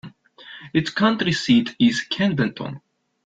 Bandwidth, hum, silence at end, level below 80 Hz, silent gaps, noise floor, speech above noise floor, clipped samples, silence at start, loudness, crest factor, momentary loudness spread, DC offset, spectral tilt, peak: 7.8 kHz; none; 0.45 s; -58 dBFS; none; -44 dBFS; 24 dB; under 0.1%; 0.05 s; -20 LUFS; 18 dB; 19 LU; under 0.1%; -5.5 dB/octave; -4 dBFS